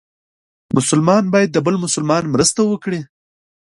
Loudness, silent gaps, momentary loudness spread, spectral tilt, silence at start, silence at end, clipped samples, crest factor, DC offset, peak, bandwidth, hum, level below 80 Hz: -16 LUFS; none; 8 LU; -4.5 dB/octave; 0.75 s; 0.6 s; under 0.1%; 16 dB; under 0.1%; 0 dBFS; 11.5 kHz; none; -54 dBFS